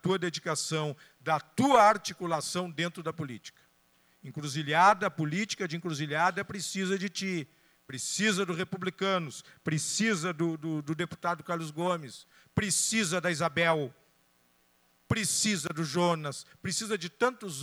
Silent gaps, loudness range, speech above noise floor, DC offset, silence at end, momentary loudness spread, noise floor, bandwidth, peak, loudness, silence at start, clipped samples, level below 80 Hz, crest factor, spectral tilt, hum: none; 3 LU; 38 dB; under 0.1%; 0 s; 13 LU; -68 dBFS; over 20 kHz; -10 dBFS; -30 LUFS; 0.05 s; under 0.1%; -66 dBFS; 22 dB; -3.5 dB/octave; none